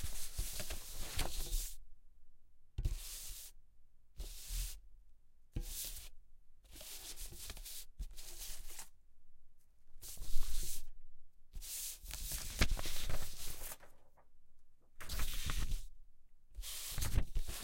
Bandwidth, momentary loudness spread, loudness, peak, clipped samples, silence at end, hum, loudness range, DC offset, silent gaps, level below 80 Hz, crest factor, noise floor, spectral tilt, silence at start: 16.5 kHz; 13 LU; -45 LUFS; -16 dBFS; under 0.1%; 0 s; none; 7 LU; under 0.1%; none; -44 dBFS; 22 dB; -58 dBFS; -2.5 dB/octave; 0 s